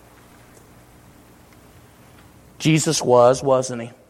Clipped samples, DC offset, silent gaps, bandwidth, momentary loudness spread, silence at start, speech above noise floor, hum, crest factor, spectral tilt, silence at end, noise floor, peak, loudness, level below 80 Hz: under 0.1%; under 0.1%; none; 16 kHz; 8 LU; 2.6 s; 31 dB; 60 Hz at -50 dBFS; 20 dB; -5 dB/octave; 0.2 s; -48 dBFS; -2 dBFS; -18 LUFS; -56 dBFS